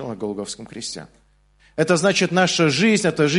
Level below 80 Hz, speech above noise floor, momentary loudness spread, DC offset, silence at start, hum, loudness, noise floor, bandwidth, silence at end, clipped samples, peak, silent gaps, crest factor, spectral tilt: -58 dBFS; 37 dB; 14 LU; under 0.1%; 0 s; 50 Hz at -50 dBFS; -19 LUFS; -57 dBFS; 11.5 kHz; 0 s; under 0.1%; -2 dBFS; none; 18 dB; -4.5 dB/octave